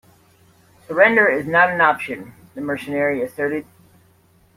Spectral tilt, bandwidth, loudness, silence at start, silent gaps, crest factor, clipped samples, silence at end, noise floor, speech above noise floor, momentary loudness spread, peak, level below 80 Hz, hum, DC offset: -6 dB/octave; 16 kHz; -18 LUFS; 0.9 s; none; 20 dB; under 0.1%; 0.95 s; -56 dBFS; 37 dB; 16 LU; -2 dBFS; -62 dBFS; none; under 0.1%